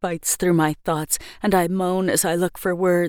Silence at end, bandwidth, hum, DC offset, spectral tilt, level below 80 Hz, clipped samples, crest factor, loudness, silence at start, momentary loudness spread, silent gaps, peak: 0 s; over 20 kHz; none; under 0.1%; -4.5 dB/octave; -48 dBFS; under 0.1%; 14 dB; -21 LUFS; 0 s; 4 LU; none; -6 dBFS